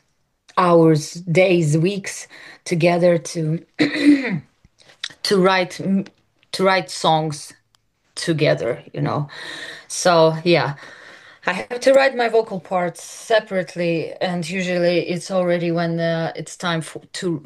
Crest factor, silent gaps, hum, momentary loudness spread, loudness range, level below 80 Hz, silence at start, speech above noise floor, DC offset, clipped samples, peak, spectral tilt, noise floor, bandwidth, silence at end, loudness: 18 dB; none; none; 15 LU; 3 LU; -64 dBFS; 0.55 s; 45 dB; under 0.1%; under 0.1%; -2 dBFS; -5.5 dB/octave; -64 dBFS; 12.5 kHz; 0.05 s; -19 LUFS